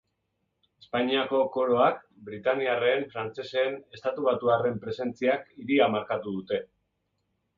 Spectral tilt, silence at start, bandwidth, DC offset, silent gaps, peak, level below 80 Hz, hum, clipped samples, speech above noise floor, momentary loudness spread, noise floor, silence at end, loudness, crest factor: -7 dB/octave; 0.95 s; 7.2 kHz; under 0.1%; none; -8 dBFS; -68 dBFS; none; under 0.1%; 51 dB; 10 LU; -78 dBFS; 0.95 s; -27 LUFS; 20 dB